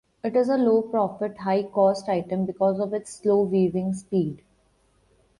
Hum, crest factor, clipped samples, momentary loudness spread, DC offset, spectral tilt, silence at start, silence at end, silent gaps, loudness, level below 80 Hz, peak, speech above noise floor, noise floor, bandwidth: none; 16 dB; under 0.1%; 7 LU; under 0.1%; -7.5 dB/octave; 0.25 s; 1 s; none; -24 LUFS; -64 dBFS; -8 dBFS; 41 dB; -64 dBFS; 11.5 kHz